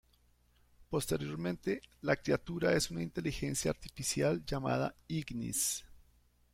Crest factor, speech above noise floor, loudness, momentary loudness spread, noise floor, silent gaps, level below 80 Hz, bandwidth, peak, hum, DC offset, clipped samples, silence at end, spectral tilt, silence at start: 20 dB; 34 dB; -35 LUFS; 6 LU; -69 dBFS; none; -56 dBFS; 16.5 kHz; -16 dBFS; 60 Hz at -60 dBFS; under 0.1%; under 0.1%; 0.55 s; -4.5 dB/octave; 0.8 s